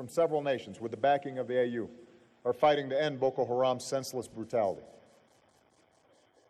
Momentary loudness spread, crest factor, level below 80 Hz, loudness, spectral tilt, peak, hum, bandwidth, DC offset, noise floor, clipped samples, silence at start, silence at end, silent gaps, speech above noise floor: 12 LU; 16 dB; -74 dBFS; -31 LUFS; -5 dB/octave; -16 dBFS; none; 13 kHz; under 0.1%; -67 dBFS; under 0.1%; 0 s; 1.65 s; none; 36 dB